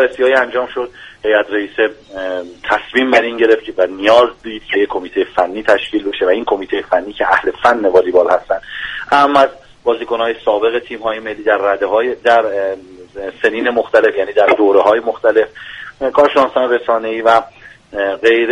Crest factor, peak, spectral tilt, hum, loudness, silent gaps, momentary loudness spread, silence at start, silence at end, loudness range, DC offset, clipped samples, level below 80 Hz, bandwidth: 14 dB; 0 dBFS; -4.5 dB/octave; none; -14 LUFS; none; 11 LU; 0 s; 0 s; 3 LU; under 0.1%; under 0.1%; -48 dBFS; 10.5 kHz